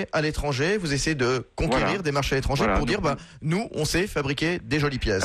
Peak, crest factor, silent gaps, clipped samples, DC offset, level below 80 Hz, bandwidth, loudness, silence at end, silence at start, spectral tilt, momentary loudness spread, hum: -12 dBFS; 12 dB; none; under 0.1%; under 0.1%; -36 dBFS; 14 kHz; -25 LUFS; 0 s; 0 s; -5 dB/octave; 4 LU; none